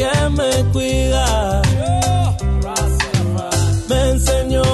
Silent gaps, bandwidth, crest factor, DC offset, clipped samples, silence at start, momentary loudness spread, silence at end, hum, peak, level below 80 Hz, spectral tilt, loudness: none; 12.5 kHz; 14 dB; under 0.1%; under 0.1%; 0 s; 3 LU; 0 s; none; -2 dBFS; -22 dBFS; -5 dB/octave; -17 LUFS